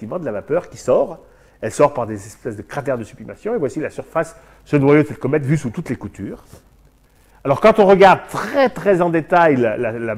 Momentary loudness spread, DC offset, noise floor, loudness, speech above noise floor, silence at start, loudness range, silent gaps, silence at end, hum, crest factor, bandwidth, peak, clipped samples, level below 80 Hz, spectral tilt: 17 LU; under 0.1%; -52 dBFS; -17 LUFS; 35 dB; 0 s; 8 LU; none; 0 s; none; 18 dB; 15 kHz; 0 dBFS; under 0.1%; -48 dBFS; -6.5 dB/octave